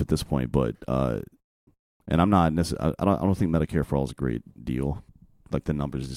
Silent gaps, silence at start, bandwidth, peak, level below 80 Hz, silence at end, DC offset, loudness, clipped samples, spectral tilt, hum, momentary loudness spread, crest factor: 1.44-1.67 s, 1.79-2.00 s; 0 s; 15.5 kHz; -6 dBFS; -40 dBFS; 0 s; under 0.1%; -26 LUFS; under 0.1%; -7.5 dB/octave; none; 11 LU; 20 dB